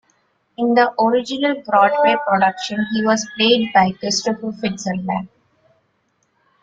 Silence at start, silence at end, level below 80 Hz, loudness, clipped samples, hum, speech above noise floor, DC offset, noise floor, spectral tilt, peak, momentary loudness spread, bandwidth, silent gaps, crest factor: 0.6 s; 1.35 s; -60 dBFS; -17 LUFS; under 0.1%; none; 48 dB; under 0.1%; -65 dBFS; -4 dB/octave; -2 dBFS; 10 LU; 9 kHz; none; 16 dB